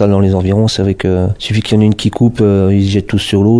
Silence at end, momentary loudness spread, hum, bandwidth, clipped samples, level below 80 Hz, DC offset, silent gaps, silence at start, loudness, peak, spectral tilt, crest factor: 0 s; 4 LU; none; 11 kHz; under 0.1%; -36 dBFS; under 0.1%; none; 0 s; -12 LUFS; 0 dBFS; -7 dB/octave; 10 dB